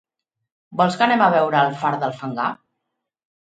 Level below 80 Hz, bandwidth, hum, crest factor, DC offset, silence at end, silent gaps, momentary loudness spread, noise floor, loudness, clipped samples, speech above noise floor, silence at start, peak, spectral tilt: -70 dBFS; 9.2 kHz; none; 18 dB; under 0.1%; 0.85 s; none; 10 LU; -79 dBFS; -19 LUFS; under 0.1%; 61 dB; 0.7 s; -2 dBFS; -6 dB/octave